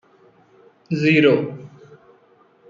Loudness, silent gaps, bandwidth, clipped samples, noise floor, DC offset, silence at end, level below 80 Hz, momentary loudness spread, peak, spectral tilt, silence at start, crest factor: -18 LUFS; none; 7.4 kHz; under 0.1%; -55 dBFS; under 0.1%; 1 s; -64 dBFS; 17 LU; -4 dBFS; -7.5 dB/octave; 0.9 s; 20 dB